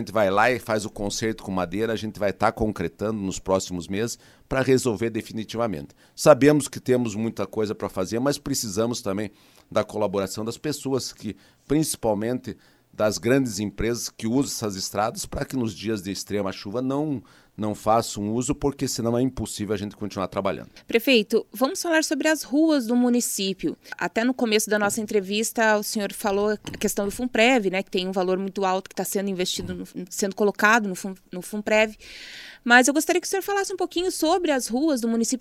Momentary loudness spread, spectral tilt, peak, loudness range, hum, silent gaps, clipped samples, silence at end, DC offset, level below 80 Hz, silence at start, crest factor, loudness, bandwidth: 11 LU; -4 dB/octave; -2 dBFS; 5 LU; none; none; under 0.1%; 0 s; under 0.1%; -50 dBFS; 0 s; 22 dB; -24 LUFS; 16 kHz